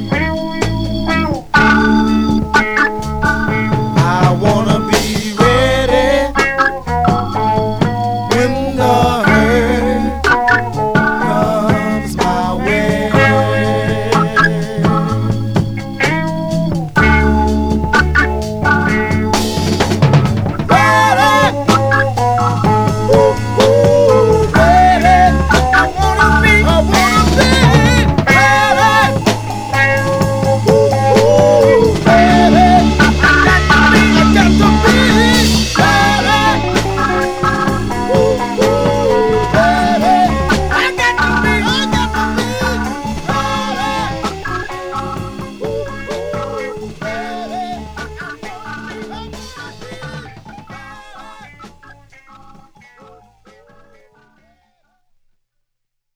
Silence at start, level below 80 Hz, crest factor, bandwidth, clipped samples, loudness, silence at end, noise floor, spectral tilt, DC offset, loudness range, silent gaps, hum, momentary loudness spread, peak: 0 s; -24 dBFS; 12 dB; over 20 kHz; under 0.1%; -12 LUFS; 4.25 s; -72 dBFS; -5.5 dB/octave; under 0.1%; 13 LU; none; none; 13 LU; 0 dBFS